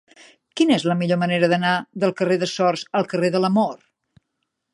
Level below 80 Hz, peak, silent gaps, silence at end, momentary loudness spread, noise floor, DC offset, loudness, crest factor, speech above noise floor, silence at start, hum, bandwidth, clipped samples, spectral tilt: -70 dBFS; -4 dBFS; none; 1 s; 5 LU; -77 dBFS; under 0.1%; -20 LUFS; 18 dB; 57 dB; 0.55 s; none; 11.5 kHz; under 0.1%; -6 dB/octave